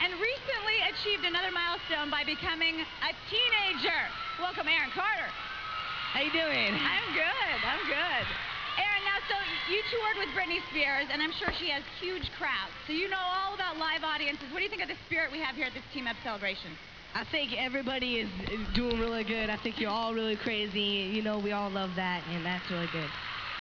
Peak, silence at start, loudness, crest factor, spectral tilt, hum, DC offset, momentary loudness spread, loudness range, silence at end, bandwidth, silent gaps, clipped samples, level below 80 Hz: -14 dBFS; 0 s; -31 LUFS; 18 dB; -4.5 dB/octave; none; under 0.1%; 7 LU; 4 LU; 0.05 s; 5.4 kHz; none; under 0.1%; -52 dBFS